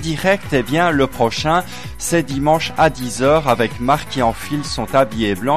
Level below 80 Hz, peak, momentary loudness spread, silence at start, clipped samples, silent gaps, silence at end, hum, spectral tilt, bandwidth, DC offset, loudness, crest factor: -38 dBFS; -2 dBFS; 4 LU; 0 s; under 0.1%; none; 0 s; none; -5 dB/octave; 15.5 kHz; 2%; -17 LUFS; 14 dB